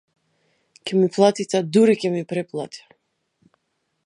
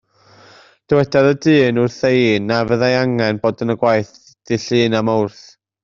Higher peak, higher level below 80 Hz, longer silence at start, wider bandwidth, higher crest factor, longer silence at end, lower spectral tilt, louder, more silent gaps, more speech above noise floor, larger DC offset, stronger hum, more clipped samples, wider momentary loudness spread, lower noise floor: about the same, -2 dBFS vs -2 dBFS; second, -74 dBFS vs -52 dBFS; about the same, 0.85 s vs 0.9 s; first, 11 kHz vs 7.6 kHz; about the same, 20 dB vs 16 dB; first, 1.3 s vs 0.55 s; about the same, -6 dB/octave vs -6.5 dB/octave; second, -20 LUFS vs -16 LUFS; neither; first, 54 dB vs 32 dB; neither; neither; neither; first, 17 LU vs 7 LU; first, -74 dBFS vs -47 dBFS